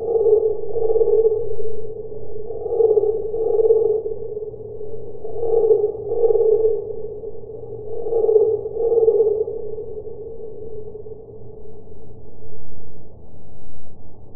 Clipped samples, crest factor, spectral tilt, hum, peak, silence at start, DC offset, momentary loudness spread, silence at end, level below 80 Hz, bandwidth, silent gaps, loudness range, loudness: under 0.1%; 16 dB; -16 dB/octave; none; -2 dBFS; 0 s; under 0.1%; 18 LU; 0 s; -48 dBFS; 1.3 kHz; none; 17 LU; -20 LUFS